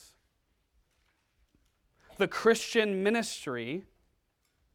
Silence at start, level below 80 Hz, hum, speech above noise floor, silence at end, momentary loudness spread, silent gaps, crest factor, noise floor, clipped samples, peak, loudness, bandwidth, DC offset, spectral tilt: 2.2 s; -68 dBFS; none; 46 dB; 0.95 s; 11 LU; none; 22 dB; -75 dBFS; under 0.1%; -12 dBFS; -29 LUFS; 16.5 kHz; under 0.1%; -4 dB/octave